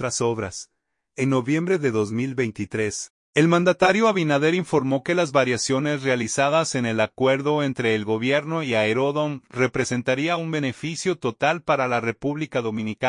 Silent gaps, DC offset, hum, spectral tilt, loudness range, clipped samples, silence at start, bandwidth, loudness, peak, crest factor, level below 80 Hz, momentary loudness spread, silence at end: 3.10-3.33 s; under 0.1%; none; -5 dB/octave; 3 LU; under 0.1%; 0 s; 11 kHz; -22 LUFS; -2 dBFS; 20 dB; -62 dBFS; 7 LU; 0 s